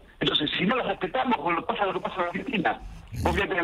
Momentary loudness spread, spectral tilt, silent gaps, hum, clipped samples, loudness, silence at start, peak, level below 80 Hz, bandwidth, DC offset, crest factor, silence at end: 6 LU; -5.5 dB/octave; none; none; under 0.1%; -26 LUFS; 0.05 s; -8 dBFS; -44 dBFS; 15.5 kHz; under 0.1%; 18 dB; 0 s